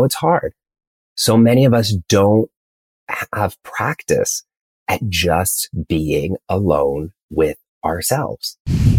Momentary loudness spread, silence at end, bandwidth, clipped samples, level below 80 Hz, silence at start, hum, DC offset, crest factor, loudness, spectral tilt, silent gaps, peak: 12 LU; 0 s; 17 kHz; under 0.1%; -36 dBFS; 0 s; none; under 0.1%; 16 dB; -18 LUFS; -5 dB/octave; 0.87-1.16 s, 2.56-3.07 s, 4.61-4.86 s, 7.23-7.29 s, 7.68-7.81 s, 8.60-8.65 s; -2 dBFS